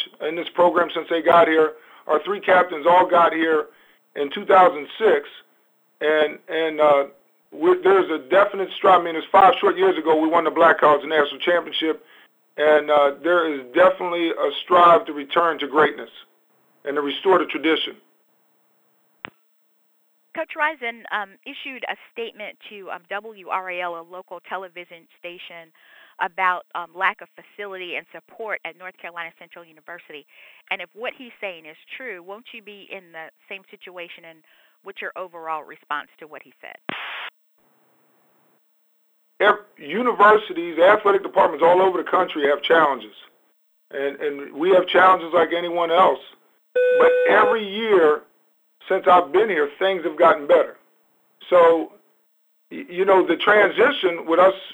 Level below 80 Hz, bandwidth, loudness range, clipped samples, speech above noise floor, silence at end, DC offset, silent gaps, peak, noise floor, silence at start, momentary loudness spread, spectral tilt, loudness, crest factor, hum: -76 dBFS; over 20 kHz; 16 LU; under 0.1%; 44 dB; 0 s; under 0.1%; none; -4 dBFS; -64 dBFS; 0 s; 22 LU; -5.5 dB/octave; -19 LUFS; 18 dB; none